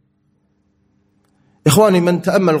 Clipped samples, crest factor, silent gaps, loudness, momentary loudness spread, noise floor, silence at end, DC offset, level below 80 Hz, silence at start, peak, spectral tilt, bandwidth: under 0.1%; 16 dB; none; -14 LUFS; 4 LU; -62 dBFS; 0 s; under 0.1%; -52 dBFS; 1.65 s; 0 dBFS; -5.5 dB/octave; 16.5 kHz